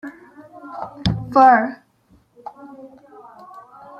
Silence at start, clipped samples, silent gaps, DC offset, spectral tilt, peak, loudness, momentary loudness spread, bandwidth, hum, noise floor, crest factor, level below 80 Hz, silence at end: 0.05 s; under 0.1%; none; under 0.1%; -7 dB/octave; -2 dBFS; -16 LUFS; 28 LU; 7.2 kHz; none; -57 dBFS; 20 dB; -46 dBFS; 0.4 s